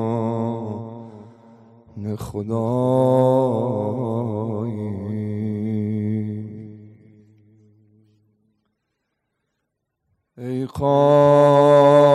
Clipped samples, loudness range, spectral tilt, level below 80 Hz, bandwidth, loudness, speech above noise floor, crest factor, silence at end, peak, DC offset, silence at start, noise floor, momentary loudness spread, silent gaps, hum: under 0.1%; 13 LU; -8.5 dB/octave; -58 dBFS; 12.5 kHz; -19 LUFS; 58 dB; 16 dB; 0 s; -4 dBFS; under 0.1%; 0 s; -77 dBFS; 20 LU; none; none